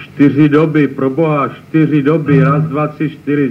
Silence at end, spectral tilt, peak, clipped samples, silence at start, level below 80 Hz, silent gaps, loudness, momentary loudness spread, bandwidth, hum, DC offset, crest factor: 0 s; -10 dB/octave; 0 dBFS; under 0.1%; 0 s; -54 dBFS; none; -12 LUFS; 7 LU; 5.4 kHz; none; under 0.1%; 12 dB